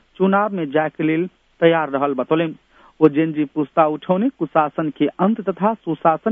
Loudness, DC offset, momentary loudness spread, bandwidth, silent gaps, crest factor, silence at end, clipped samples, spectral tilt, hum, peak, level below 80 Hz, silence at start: -19 LUFS; under 0.1%; 5 LU; 3.8 kHz; none; 18 dB; 0 s; under 0.1%; -10 dB/octave; none; 0 dBFS; -64 dBFS; 0.2 s